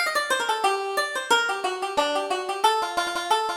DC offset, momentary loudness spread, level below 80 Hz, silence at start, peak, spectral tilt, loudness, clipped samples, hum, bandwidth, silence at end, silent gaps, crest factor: under 0.1%; 4 LU; -64 dBFS; 0 s; -8 dBFS; 0 dB/octave; -24 LUFS; under 0.1%; none; 17.5 kHz; 0 s; none; 18 dB